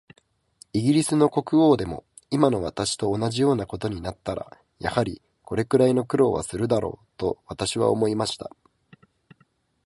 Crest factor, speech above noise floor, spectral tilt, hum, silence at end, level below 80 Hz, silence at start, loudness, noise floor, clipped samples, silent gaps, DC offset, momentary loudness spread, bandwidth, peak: 22 dB; 42 dB; -6 dB/octave; none; 1.4 s; -50 dBFS; 0.75 s; -24 LUFS; -65 dBFS; under 0.1%; none; under 0.1%; 13 LU; 11.5 kHz; -2 dBFS